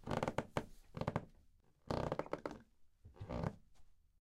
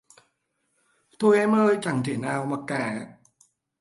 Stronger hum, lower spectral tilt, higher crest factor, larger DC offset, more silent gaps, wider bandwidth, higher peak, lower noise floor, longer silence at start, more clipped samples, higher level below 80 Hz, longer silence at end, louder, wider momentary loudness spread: neither; about the same, -6.5 dB/octave vs -6.5 dB/octave; first, 24 dB vs 18 dB; neither; neither; first, 15.5 kHz vs 11.5 kHz; second, -20 dBFS vs -8 dBFS; second, -69 dBFS vs -74 dBFS; second, 0 s vs 1.2 s; neither; first, -58 dBFS vs -70 dBFS; second, 0.25 s vs 0.7 s; second, -44 LUFS vs -24 LUFS; first, 15 LU vs 12 LU